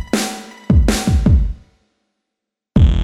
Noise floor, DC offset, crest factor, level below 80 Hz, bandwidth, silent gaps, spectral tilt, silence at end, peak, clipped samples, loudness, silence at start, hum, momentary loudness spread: -81 dBFS; under 0.1%; 16 dB; -18 dBFS; 15 kHz; none; -6 dB/octave; 0 s; 0 dBFS; under 0.1%; -16 LUFS; 0 s; none; 13 LU